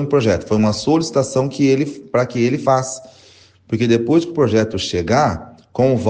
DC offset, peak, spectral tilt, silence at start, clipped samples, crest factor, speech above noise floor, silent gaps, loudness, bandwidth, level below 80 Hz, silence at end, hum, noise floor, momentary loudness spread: under 0.1%; -2 dBFS; -6 dB/octave; 0 s; under 0.1%; 14 dB; 32 dB; none; -17 LUFS; 9.8 kHz; -50 dBFS; 0 s; none; -48 dBFS; 5 LU